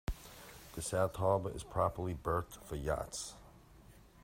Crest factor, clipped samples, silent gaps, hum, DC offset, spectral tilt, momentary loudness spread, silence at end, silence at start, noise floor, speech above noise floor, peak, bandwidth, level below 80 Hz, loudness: 22 dB; under 0.1%; none; none; under 0.1%; -5 dB/octave; 16 LU; 0 s; 0.1 s; -60 dBFS; 23 dB; -18 dBFS; 16 kHz; -52 dBFS; -37 LUFS